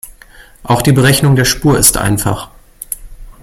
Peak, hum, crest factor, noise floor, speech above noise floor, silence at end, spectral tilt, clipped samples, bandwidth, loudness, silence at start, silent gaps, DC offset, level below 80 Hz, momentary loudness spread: 0 dBFS; none; 14 dB; -40 dBFS; 29 dB; 0.1 s; -4 dB/octave; 0.2%; 17 kHz; -10 LUFS; 0.05 s; none; under 0.1%; -30 dBFS; 17 LU